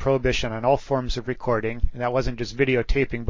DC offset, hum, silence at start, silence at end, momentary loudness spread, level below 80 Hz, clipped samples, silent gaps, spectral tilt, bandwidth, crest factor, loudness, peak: under 0.1%; none; 0 s; 0 s; 6 LU; -32 dBFS; under 0.1%; none; -6 dB/octave; 7.6 kHz; 16 dB; -24 LUFS; -6 dBFS